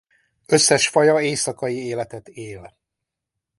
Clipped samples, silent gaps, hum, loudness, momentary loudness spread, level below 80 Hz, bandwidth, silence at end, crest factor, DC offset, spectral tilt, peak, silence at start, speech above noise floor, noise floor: under 0.1%; none; none; -18 LUFS; 21 LU; -60 dBFS; 11.5 kHz; 0.9 s; 22 dB; under 0.1%; -3 dB/octave; 0 dBFS; 0.5 s; 63 dB; -83 dBFS